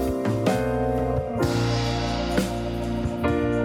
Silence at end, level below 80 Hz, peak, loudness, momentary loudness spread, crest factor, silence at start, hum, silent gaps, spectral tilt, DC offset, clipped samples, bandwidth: 0 s; -36 dBFS; -8 dBFS; -25 LUFS; 4 LU; 16 dB; 0 s; none; none; -6.5 dB/octave; under 0.1%; under 0.1%; 17 kHz